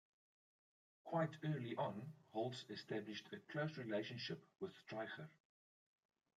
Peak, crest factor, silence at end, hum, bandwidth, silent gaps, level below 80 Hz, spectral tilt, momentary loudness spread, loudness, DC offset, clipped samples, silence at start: -30 dBFS; 20 dB; 1.05 s; none; 9.2 kHz; none; -90 dBFS; -6.5 dB/octave; 10 LU; -47 LUFS; under 0.1%; under 0.1%; 1.05 s